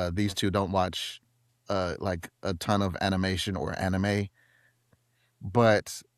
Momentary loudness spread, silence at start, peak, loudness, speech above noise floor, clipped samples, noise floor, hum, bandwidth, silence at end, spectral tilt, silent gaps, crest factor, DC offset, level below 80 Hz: 11 LU; 0 s; -10 dBFS; -28 LUFS; 41 dB; under 0.1%; -69 dBFS; none; 14.5 kHz; 0.15 s; -5.5 dB/octave; none; 20 dB; under 0.1%; -54 dBFS